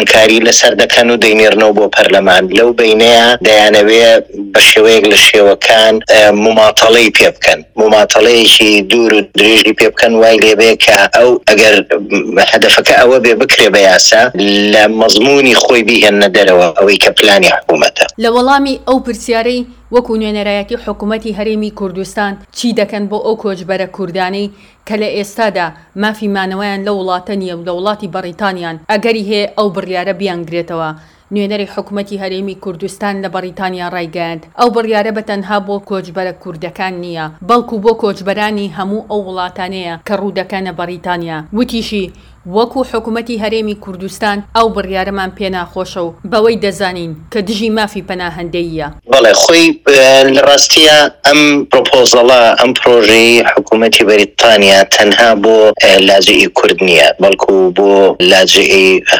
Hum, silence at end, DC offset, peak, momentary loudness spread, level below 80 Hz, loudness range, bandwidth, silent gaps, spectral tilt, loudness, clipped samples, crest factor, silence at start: none; 0 s; under 0.1%; 0 dBFS; 15 LU; -42 dBFS; 12 LU; over 20 kHz; none; -2.5 dB/octave; -8 LUFS; 4%; 8 dB; 0 s